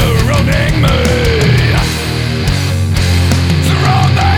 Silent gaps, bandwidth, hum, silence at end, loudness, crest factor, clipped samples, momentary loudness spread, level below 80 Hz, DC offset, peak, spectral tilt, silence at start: none; 17.5 kHz; none; 0 s; -11 LUFS; 10 dB; under 0.1%; 4 LU; -20 dBFS; 0.9%; 0 dBFS; -5.5 dB/octave; 0 s